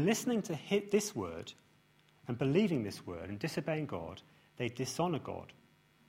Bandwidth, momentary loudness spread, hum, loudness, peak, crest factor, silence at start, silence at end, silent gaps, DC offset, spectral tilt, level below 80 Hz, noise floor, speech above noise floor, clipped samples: 16 kHz; 16 LU; none; -36 LUFS; -16 dBFS; 20 dB; 0 s; 0.55 s; none; under 0.1%; -5.5 dB/octave; -68 dBFS; -67 dBFS; 32 dB; under 0.1%